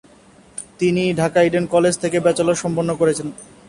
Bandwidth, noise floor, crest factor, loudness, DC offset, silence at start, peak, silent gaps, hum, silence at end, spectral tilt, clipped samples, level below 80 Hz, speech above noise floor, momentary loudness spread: 11.5 kHz; -48 dBFS; 16 dB; -18 LUFS; under 0.1%; 0.55 s; -4 dBFS; none; none; 0.25 s; -5.5 dB/octave; under 0.1%; -52 dBFS; 31 dB; 15 LU